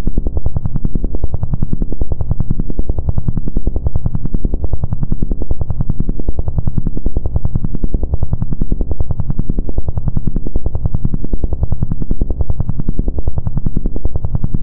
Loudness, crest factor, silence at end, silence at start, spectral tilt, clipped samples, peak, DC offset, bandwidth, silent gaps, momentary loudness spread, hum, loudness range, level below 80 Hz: -21 LUFS; 6 dB; 0 s; 0 s; -17 dB/octave; under 0.1%; -2 dBFS; under 0.1%; 1.4 kHz; none; 2 LU; none; 0 LU; -18 dBFS